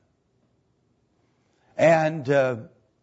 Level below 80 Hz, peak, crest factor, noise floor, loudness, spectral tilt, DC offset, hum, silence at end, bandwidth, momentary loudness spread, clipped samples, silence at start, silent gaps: -72 dBFS; -8 dBFS; 18 dB; -68 dBFS; -21 LUFS; -6.5 dB/octave; under 0.1%; none; 0.35 s; 8 kHz; 16 LU; under 0.1%; 1.8 s; none